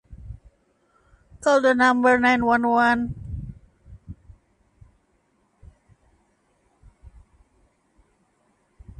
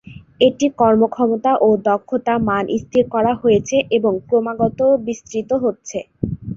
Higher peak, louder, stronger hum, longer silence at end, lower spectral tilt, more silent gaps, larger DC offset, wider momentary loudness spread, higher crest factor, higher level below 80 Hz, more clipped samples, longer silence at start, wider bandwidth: second, -6 dBFS vs -2 dBFS; about the same, -19 LUFS vs -17 LUFS; neither; first, 4.85 s vs 0 s; about the same, -5.5 dB/octave vs -6 dB/octave; neither; neither; first, 27 LU vs 10 LU; about the same, 18 dB vs 16 dB; about the same, -48 dBFS vs -46 dBFS; neither; about the same, 0.1 s vs 0.05 s; first, 11 kHz vs 7.6 kHz